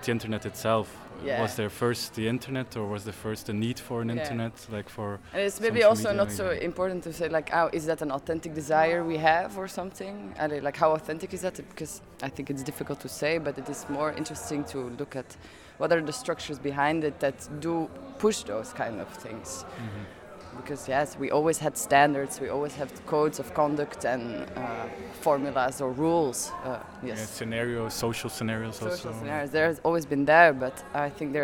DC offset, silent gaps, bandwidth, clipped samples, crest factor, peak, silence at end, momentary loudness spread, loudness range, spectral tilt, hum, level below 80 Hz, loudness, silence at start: under 0.1%; none; 18 kHz; under 0.1%; 24 dB; -6 dBFS; 0 s; 13 LU; 6 LU; -4.5 dB/octave; none; -58 dBFS; -29 LUFS; 0 s